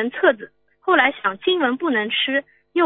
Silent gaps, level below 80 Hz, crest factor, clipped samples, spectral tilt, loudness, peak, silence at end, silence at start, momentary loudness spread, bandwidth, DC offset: none; -72 dBFS; 20 dB; under 0.1%; -8 dB/octave; -20 LUFS; -2 dBFS; 0 s; 0 s; 9 LU; 4.1 kHz; under 0.1%